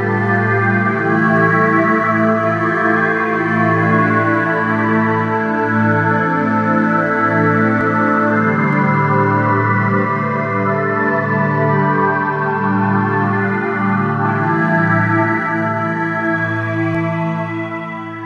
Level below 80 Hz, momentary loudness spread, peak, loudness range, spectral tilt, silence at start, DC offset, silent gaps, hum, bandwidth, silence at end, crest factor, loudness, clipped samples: -60 dBFS; 4 LU; -2 dBFS; 2 LU; -9 dB/octave; 0 s; under 0.1%; none; none; 7 kHz; 0 s; 14 dB; -15 LUFS; under 0.1%